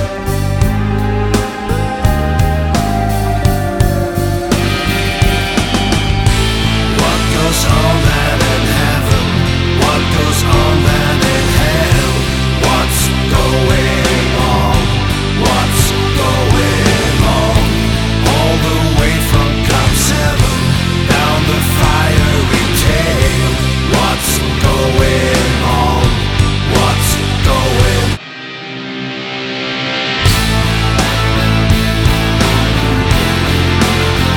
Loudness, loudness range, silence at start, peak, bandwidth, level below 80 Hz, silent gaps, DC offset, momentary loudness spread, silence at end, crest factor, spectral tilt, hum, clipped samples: -12 LUFS; 3 LU; 0 s; 0 dBFS; 19 kHz; -18 dBFS; none; under 0.1%; 4 LU; 0 s; 12 dB; -4.5 dB/octave; none; under 0.1%